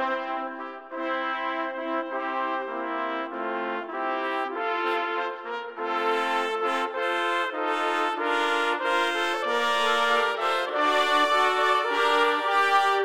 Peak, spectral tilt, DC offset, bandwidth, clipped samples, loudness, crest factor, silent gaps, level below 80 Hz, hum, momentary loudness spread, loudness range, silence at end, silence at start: -8 dBFS; -1 dB/octave; under 0.1%; 16.5 kHz; under 0.1%; -25 LUFS; 18 dB; none; -78 dBFS; none; 9 LU; 7 LU; 0 s; 0 s